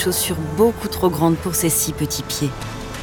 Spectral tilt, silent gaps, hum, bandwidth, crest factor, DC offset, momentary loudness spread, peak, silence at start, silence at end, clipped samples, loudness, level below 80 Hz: -4.5 dB/octave; none; none; over 20 kHz; 16 dB; under 0.1%; 7 LU; -4 dBFS; 0 s; 0 s; under 0.1%; -20 LUFS; -40 dBFS